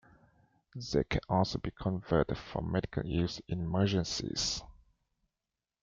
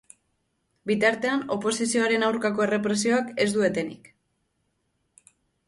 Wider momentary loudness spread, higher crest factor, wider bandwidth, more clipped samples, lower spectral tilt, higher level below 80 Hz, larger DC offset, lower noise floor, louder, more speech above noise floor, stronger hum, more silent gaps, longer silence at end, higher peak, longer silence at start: about the same, 7 LU vs 6 LU; about the same, 20 dB vs 18 dB; second, 7.6 kHz vs 11.5 kHz; neither; first, -5.5 dB/octave vs -4 dB/octave; first, -50 dBFS vs -68 dBFS; neither; first, under -90 dBFS vs -74 dBFS; second, -33 LUFS vs -24 LUFS; first, over 57 dB vs 50 dB; neither; neither; second, 1.1 s vs 1.7 s; second, -14 dBFS vs -8 dBFS; about the same, 0.75 s vs 0.85 s